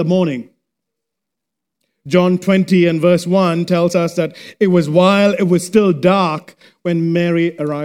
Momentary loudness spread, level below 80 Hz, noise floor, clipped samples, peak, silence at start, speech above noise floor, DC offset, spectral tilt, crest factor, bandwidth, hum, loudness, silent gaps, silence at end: 8 LU; -60 dBFS; -81 dBFS; under 0.1%; 0 dBFS; 0 s; 67 dB; under 0.1%; -6.5 dB/octave; 14 dB; 14.5 kHz; none; -14 LUFS; none; 0 s